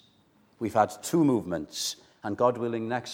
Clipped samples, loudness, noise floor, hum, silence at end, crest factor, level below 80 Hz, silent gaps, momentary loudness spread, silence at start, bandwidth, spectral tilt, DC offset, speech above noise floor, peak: under 0.1%; -28 LUFS; -63 dBFS; none; 0 s; 20 dB; -66 dBFS; none; 11 LU; 0.6 s; 17 kHz; -5 dB/octave; under 0.1%; 36 dB; -8 dBFS